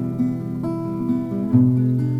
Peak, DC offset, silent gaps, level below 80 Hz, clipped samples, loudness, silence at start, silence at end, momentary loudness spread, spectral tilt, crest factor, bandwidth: -4 dBFS; under 0.1%; none; -52 dBFS; under 0.1%; -21 LUFS; 0 s; 0 s; 9 LU; -11 dB/octave; 16 dB; 4.8 kHz